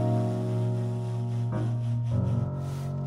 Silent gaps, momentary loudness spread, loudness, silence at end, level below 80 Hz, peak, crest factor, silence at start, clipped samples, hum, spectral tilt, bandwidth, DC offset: none; 4 LU; -29 LUFS; 0 s; -54 dBFS; -16 dBFS; 12 dB; 0 s; under 0.1%; none; -9 dB/octave; 9.8 kHz; under 0.1%